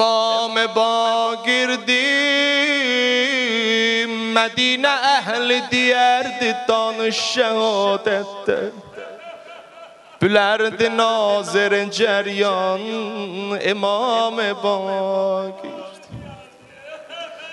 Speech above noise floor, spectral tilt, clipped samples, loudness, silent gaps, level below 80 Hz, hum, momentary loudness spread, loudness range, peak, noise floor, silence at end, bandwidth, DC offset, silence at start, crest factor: 25 dB; -3 dB/octave; under 0.1%; -18 LUFS; none; -64 dBFS; none; 17 LU; 5 LU; -2 dBFS; -43 dBFS; 0 s; 11.5 kHz; under 0.1%; 0 s; 18 dB